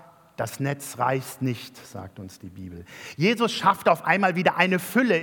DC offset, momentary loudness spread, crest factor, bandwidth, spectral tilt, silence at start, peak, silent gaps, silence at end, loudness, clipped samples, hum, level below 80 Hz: under 0.1%; 20 LU; 22 dB; 18 kHz; -5 dB/octave; 0.4 s; -2 dBFS; none; 0 s; -23 LUFS; under 0.1%; none; -68 dBFS